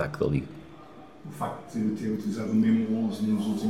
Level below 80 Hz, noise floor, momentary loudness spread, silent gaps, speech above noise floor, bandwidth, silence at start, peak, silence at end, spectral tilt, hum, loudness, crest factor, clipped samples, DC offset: -54 dBFS; -48 dBFS; 22 LU; none; 21 dB; 13 kHz; 0 s; -14 dBFS; 0 s; -7.5 dB/octave; none; -28 LUFS; 14 dB; under 0.1%; 0.2%